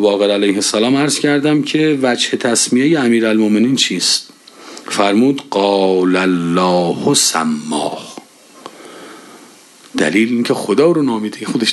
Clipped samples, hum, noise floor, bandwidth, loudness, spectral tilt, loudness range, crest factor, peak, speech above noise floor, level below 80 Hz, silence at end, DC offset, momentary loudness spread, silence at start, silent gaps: under 0.1%; none; -42 dBFS; 12.5 kHz; -14 LUFS; -3.5 dB/octave; 6 LU; 14 dB; 0 dBFS; 29 dB; -62 dBFS; 0 s; under 0.1%; 9 LU; 0 s; none